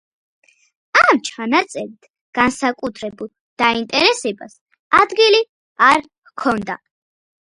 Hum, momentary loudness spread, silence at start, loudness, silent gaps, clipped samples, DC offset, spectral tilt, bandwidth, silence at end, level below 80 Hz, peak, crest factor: none; 17 LU; 0.95 s; -16 LUFS; 2.10-2.14 s, 2.21-2.33 s, 3.40-3.57 s, 4.61-4.66 s, 4.79-4.91 s, 5.49-5.76 s, 6.18-6.22 s; under 0.1%; under 0.1%; -3 dB/octave; 11.5 kHz; 0.8 s; -56 dBFS; 0 dBFS; 18 dB